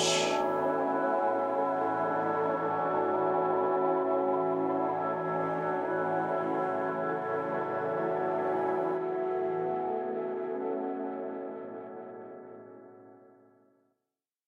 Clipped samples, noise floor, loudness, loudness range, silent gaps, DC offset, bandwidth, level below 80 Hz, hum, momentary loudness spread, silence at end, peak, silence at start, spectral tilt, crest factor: under 0.1%; -88 dBFS; -31 LUFS; 9 LU; none; under 0.1%; 12 kHz; -80 dBFS; none; 11 LU; 1.3 s; -16 dBFS; 0 s; -4.5 dB/octave; 14 dB